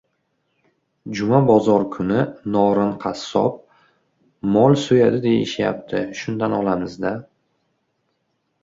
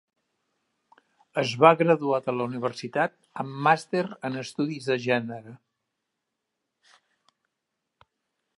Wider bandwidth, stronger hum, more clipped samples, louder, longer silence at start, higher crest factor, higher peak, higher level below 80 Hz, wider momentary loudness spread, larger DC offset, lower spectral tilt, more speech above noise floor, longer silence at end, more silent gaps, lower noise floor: second, 7.8 kHz vs 11.5 kHz; neither; neither; first, -19 LUFS vs -25 LUFS; second, 1.05 s vs 1.35 s; second, 18 dB vs 26 dB; about the same, -2 dBFS vs -2 dBFS; first, -56 dBFS vs -78 dBFS; about the same, 12 LU vs 14 LU; neither; about the same, -7 dB/octave vs -6 dB/octave; second, 52 dB vs 58 dB; second, 1.4 s vs 3.05 s; neither; second, -71 dBFS vs -83 dBFS